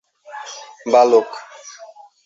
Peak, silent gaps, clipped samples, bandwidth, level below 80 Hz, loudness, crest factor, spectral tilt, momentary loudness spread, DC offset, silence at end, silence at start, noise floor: 0 dBFS; none; under 0.1%; 7.8 kHz; -70 dBFS; -14 LUFS; 18 dB; -3 dB/octave; 25 LU; under 0.1%; 0.4 s; 0.35 s; -42 dBFS